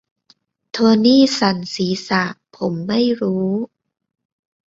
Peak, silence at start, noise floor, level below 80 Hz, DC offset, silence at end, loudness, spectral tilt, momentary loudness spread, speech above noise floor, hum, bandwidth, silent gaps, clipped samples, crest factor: -2 dBFS; 0.75 s; -58 dBFS; -58 dBFS; under 0.1%; 1 s; -17 LUFS; -5.5 dB/octave; 13 LU; 41 dB; none; 7.8 kHz; none; under 0.1%; 16 dB